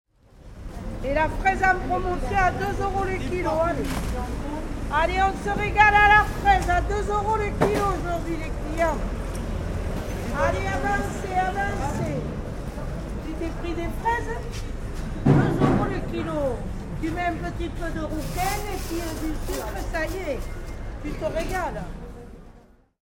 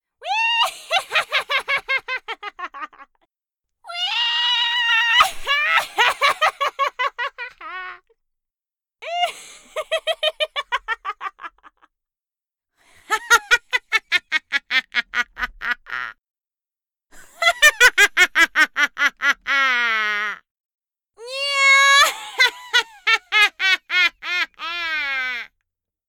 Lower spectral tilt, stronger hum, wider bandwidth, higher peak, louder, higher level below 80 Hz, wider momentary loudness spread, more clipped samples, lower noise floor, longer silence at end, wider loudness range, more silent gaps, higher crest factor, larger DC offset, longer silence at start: first, -6 dB/octave vs 1.5 dB/octave; neither; about the same, over 20 kHz vs 19 kHz; about the same, -2 dBFS vs -2 dBFS; second, -25 LUFS vs -18 LUFS; first, -32 dBFS vs -54 dBFS; second, 13 LU vs 18 LU; neither; second, -52 dBFS vs under -90 dBFS; second, 0.45 s vs 0.65 s; about the same, 9 LU vs 11 LU; second, none vs 20.51-20.64 s, 20.74-20.78 s; about the same, 22 dB vs 20 dB; neither; first, 0.35 s vs 0.2 s